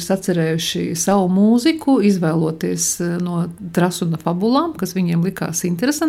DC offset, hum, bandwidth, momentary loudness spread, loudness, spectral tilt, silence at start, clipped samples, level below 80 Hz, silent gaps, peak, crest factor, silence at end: under 0.1%; none; 16 kHz; 7 LU; -18 LUFS; -5 dB/octave; 0 s; under 0.1%; -54 dBFS; none; -4 dBFS; 14 dB; 0 s